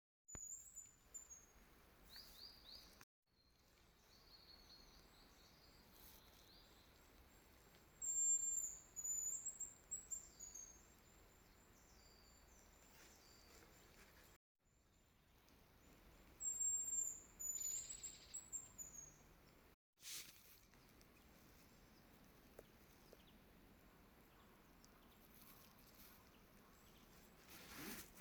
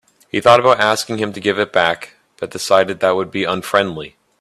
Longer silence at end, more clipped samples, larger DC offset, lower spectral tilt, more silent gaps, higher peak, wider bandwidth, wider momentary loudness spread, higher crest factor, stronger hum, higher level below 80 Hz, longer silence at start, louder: second, 0 s vs 0.35 s; neither; neither; second, -0.5 dB/octave vs -4 dB/octave; first, 3.03-3.22 s, 14.36-14.55 s, 19.74-19.93 s vs none; second, -34 dBFS vs 0 dBFS; first, over 20 kHz vs 14 kHz; first, 25 LU vs 17 LU; first, 22 dB vs 16 dB; neither; second, -74 dBFS vs -56 dBFS; about the same, 0.3 s vs 0.35 s; second, -46 LUFS vs -16 LUFS